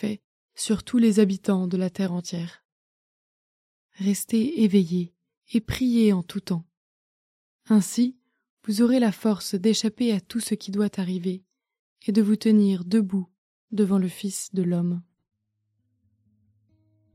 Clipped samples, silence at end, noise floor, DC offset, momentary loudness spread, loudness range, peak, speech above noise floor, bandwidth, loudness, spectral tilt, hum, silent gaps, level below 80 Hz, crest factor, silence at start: under 0.1%; 2.15 s; -76 dBFS; under 0.1%; 12 LU; 4 LU; -8 dBFS; 53 dB; 15.5 kHz; -24 LUFS; -6 dB/octave; none; 0.24-0.49 s, 2.65-3.89 s, 5.37-5.41 s, 6.77-7.59 s, 8.50-8.57 s, 11.79-11.96 s, 13.38-13.68 s; -58 dBFS; 18 dB; 0 s